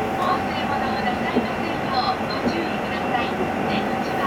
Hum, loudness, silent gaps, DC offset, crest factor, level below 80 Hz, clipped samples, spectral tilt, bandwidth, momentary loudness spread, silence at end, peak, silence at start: none; -23 LUFS; none; under 0.1%; 16 dB; -46 dBFS; under 0.1%; -5.5 dB/octave; 18 kHz; 2 LU; 0 s; -8 dBFS; 0 s